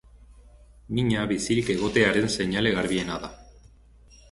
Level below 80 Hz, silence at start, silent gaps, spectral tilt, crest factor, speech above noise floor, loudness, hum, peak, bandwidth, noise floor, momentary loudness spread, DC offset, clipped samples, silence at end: -48 dBFS; 0.15 s; none; -5 dB/octave; 20 dB; 29 dB; -25 LUFS; none; -6 dBFS; 11.5 kHz; -53 dBFS; 11 LU; under 0.1%; under 0.1%; 0.8 s